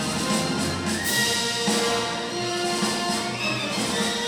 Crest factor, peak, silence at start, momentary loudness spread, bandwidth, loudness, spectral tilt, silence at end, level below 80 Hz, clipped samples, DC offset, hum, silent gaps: 14 dB; -10 dBFS; 0 s; 4 LU; 19 kHz; -24 LUFS; -2.5 dB/octave; 0 s; -54 dBFS; under 0.1%; under 0.1%; none; none